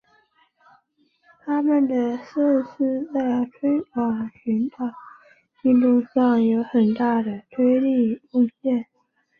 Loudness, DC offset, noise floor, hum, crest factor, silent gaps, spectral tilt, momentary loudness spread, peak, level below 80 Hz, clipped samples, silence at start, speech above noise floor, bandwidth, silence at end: -22 LUFS; under 0.1%; -65 dBFS; none; 14 dB; none; -9 dB/octave; 8 LU; -8 dBFS; -66 dBFS; under 0.1%; 1.45 s; 44 dB; 4.9 kHz; 0.55 s